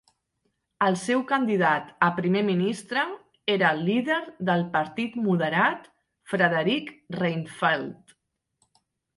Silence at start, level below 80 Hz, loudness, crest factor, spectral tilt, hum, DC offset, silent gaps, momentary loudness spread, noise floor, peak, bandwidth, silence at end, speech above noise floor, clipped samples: 0.8 s; -70 dBFS; -25 LUFS; 20 dB; -6 dB/octave; none; under 0.1%; none; 7 LU; -76 dBFS; -6 dBFS; 11.5 kHz; 1.25 s; 51 dB; under 0.1%